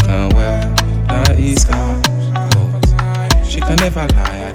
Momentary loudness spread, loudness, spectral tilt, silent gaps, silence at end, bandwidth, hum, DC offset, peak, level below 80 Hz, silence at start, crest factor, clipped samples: 3 LU; -14 LUFS; -5 dB/octave; none; 0 s; 16.5 kHz; none; under 0.1%; 0 dBFS; -16 dBFS; 0 s; 12 dB; under 0.1%